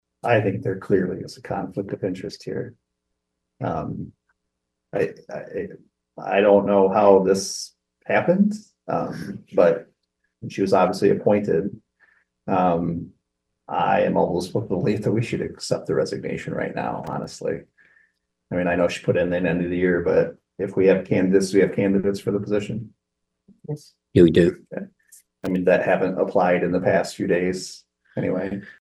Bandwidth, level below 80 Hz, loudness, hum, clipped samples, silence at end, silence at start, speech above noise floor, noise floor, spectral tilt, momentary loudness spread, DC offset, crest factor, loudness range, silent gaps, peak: 12.5 kHz; -54 dBFS; -22 LUFS; none; under 0.1%; 0.1 s; 0.25 s; 58 dB; -79 dBFS; -6.5 dB/octave; 16 LU; under 0.1%; 20 dB; 8 LU; none; -2 dBFS